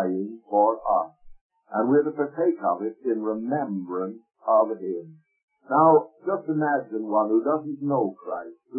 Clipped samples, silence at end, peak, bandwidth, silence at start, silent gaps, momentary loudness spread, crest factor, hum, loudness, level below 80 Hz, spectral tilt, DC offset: under 0.1%; 0 s; -6 dBFS; 2.5 kHz; 0 s; 1.41-1.50 s, 5.43-5.48 s; 11 LU; 18 dB; none; -25 LUFS; -66 dBFS; -14 dB/octave; under 0.1%